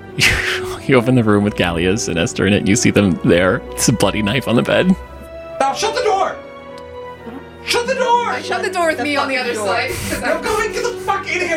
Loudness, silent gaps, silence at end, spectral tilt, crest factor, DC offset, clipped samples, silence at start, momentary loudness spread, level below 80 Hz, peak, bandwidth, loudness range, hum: -16 LUFS; none; 0 s; -4.5 dB/octave; 16 dB; under 0.1%; under 0.1%; 0 s; 18 LU; -38 dBFS; 0 dBFS; 16.5 kHz; 4 LU; none